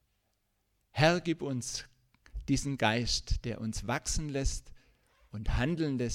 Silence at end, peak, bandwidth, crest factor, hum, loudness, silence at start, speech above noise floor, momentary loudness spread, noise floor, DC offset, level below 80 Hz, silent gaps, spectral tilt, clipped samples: 0 s; -10 dBFS; 16 kHz; 22 dB; none; -32 LUFS; 0.95 s; 46 dB; 14 LU; -77 dBFS; under 0.1%; -42 dBFS; none; -4.5 dB/octave; under 0.1%